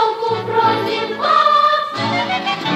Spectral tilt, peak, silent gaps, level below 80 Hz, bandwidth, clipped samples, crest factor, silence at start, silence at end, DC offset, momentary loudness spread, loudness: -4.5 dB/octave; -2 dBFS; none; -62 dBFS; 15 kHz; under 0.1%; 14 dB; 0 s; 0 s; under 0.1%; 7 LU; -16 LUFS